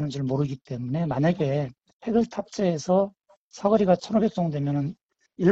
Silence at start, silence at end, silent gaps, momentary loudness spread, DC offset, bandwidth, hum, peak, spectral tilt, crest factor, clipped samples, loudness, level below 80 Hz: 0 s; 0 s; 1.93-2.00 s, 3.37-3.51 s, 5.03-5.09 s; 9 LU; under 0.1%; 8 kHz; none; -8 dBFS; -7.5 dB/octave; 18 dB; under 0.1%; -25 LUFS; -58 dBFS